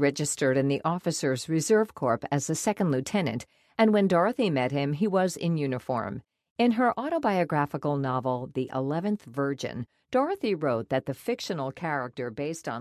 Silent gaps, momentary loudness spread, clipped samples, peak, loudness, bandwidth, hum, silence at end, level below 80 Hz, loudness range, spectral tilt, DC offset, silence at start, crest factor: 6.51-6.56 s; 9 LU; under 0.1%; -10 dBFS; -27 LUFS; 14 kHz; none; 0 s; -64 dBFS; 4 LU; -5.5 dB/octave; under 0.1%; 0 s; 18 dB